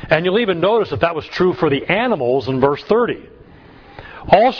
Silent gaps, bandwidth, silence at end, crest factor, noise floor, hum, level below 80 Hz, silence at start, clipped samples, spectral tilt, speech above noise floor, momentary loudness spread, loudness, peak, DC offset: none; 5.4 kHz; 0 s; 16 dB; -42 dBFS; none; -44 dBFS; 0 s; under 0.1%; -7.5 dB/octave; 27 dB; 6 LU; -17 LUFS; 0 dBFS; under 0.1%